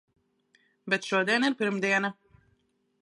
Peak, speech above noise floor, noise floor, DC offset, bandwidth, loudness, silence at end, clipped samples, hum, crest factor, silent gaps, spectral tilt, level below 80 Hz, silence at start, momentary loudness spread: -10 dBFS; 45 dB; -72 dBFS; under 0.1%; 11.5 kHz; -27 LUFS; 0.9 s; under 0.1%; none; 20 dB; none; -4 dB/octave; -76 dBFS; 0.85 s; 8 LU